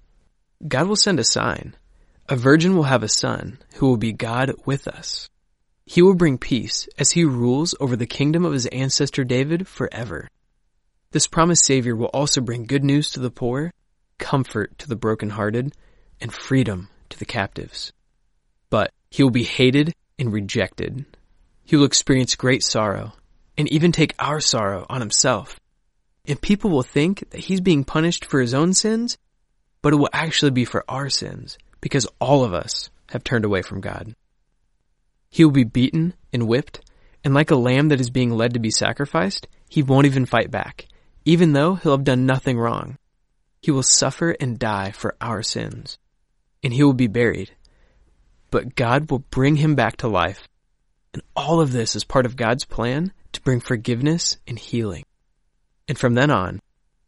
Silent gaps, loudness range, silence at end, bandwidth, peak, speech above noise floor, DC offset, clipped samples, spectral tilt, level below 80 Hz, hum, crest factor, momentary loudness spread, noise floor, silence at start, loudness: none; 4 LU; 0.5 s; 11.5 kHz; 0 dBFS; 47 dB; under 0.1%; under 0.1%; -4.5 dB/octave; -46 dBFS; none; 20 dB; 14 LU; -66 dBFS; 0.6 s; -20 LUFS